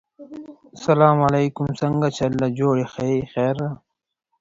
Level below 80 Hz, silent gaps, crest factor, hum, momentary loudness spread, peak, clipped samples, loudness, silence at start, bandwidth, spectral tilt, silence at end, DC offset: -52 dBFS; none; 20 dB; none; 23 LU; -2 dBFS; under 0.1%; -21 LUFS; 0.2 s; 7.8 kHz; -7.5 dB/octave; 0.65 s; under 0.1%